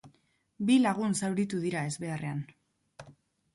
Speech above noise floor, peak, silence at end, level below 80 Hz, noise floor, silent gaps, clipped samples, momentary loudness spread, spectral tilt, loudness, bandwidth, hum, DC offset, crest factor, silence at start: 40 dB; -14 dBFS; 0.45 s; -70 dBFS; -69 dBFS; none; under 0.1%; 12 LU; -5.5 dB/octave; -30 LUFS; 11.5 kHz; none; under 0.1%; 18 dB; 0.05 s